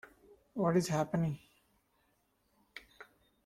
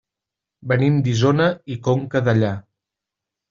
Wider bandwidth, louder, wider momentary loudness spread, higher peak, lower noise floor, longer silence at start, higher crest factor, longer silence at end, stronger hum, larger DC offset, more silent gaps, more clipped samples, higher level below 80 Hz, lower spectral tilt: first, 15 kHz vs 7.4 kHz; second, -33 LUFS vs -19 LUFS; first, 22 LU vs 8 LU; second, -18 dBFS vs -4 dBFS; second, -76 dBFS vs -86 dBFS; about the same, 0.55 s vs 0.65 s; about the same, 20 dB vs 16 dB; second, 0.4 s vs 0.9 s; neither; neither; neither; neither; second, -68 dBFS vs -56 dBFS; about the same, -6.5 dB/octave vs -6.5 dB/octave